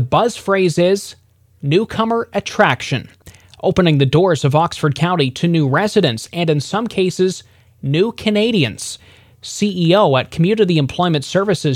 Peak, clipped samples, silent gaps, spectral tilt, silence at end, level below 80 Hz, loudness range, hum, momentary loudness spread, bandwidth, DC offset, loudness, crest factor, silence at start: 0 dBFS; under 0.1%; none; -6 dB/octave; 0 s; -48 dBFS; 3 LU; none; 9 LU; 14 kHz; under 0.1%; -16 LUFS; 16 dB; 0 s